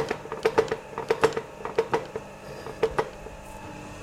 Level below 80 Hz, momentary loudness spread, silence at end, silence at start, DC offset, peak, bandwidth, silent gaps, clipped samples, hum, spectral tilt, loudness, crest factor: -52 dBFS; 16 LU; 0 s; 0 s; under 0.1%; -6 dBFS; 15.5 kHz; none; under 0.1%; none; -4.5 dB/octave; -28 LUFS; 24 dB